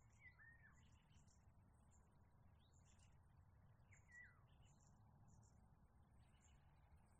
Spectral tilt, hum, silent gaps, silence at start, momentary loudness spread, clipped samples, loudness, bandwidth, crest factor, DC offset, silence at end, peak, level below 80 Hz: -4.5 dB/octave; none; none; 0 s; 3 LU; under 0.1%; -67 LUFS; 9.4 kHz; 16 dB; under 0.1%; 0 s; -56 dBFS; -78 dBFS